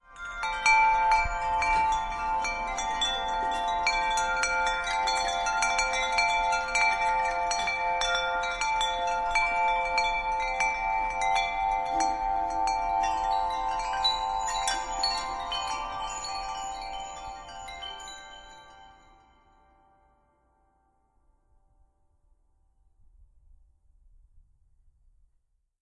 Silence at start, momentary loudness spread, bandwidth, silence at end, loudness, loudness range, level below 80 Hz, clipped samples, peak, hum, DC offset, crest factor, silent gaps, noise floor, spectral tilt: 0.1 s; 11 LU; 11.5 kHz; 1.45 s; -27 LUFS; 12 LU; -46 dBFS; under 0.1%; -10 dBFS; none; under 0.1%; 18 dB; none; -72 dBFS; -0.5 dB/octave